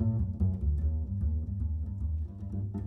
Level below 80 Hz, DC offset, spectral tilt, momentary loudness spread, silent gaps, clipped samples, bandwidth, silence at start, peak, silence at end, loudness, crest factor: -34 dBFS; under 0.1%; -12.5 dB/octave; 6 LU; none; under 0.1%; 1.4 kHz; 0 s; -18 dBFS; 0 s; -33 LUFS; 14 dB